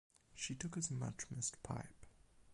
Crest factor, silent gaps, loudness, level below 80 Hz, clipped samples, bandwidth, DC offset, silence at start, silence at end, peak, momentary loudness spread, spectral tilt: 20 dB; none; -45 LUFS; -66 dBFS; under 0.1%; 11.5 kHz; under 0.1%; 0.3 s; 0 s; -26 dBFS; 8 LU; -3.5 dB/octave